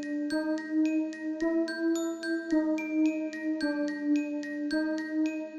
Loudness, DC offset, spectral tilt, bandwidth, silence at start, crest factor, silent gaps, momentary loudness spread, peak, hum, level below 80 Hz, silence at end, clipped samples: -30 LUFS; under 0.1%; -3.5 dB/octave; 8.8 kHz; 0 s; 12 dB; none; 5 LU; -18 dBFS; none; -68 dBFS; 0 s; under 0.1%